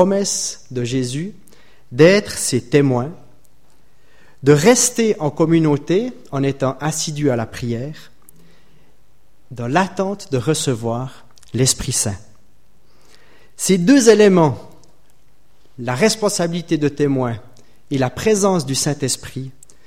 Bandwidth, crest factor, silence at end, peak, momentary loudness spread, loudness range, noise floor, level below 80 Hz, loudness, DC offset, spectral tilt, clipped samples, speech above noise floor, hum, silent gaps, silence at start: 16.5 kHz; 18 dB; 0.35 s; 0 dBFS; 16 LU; 7 LU; -58 dBFS; -48 dBFS; -17 LUFS; 1%; -4.5 dB/octave; under 0.1%; 41 dB; none; none; 0 s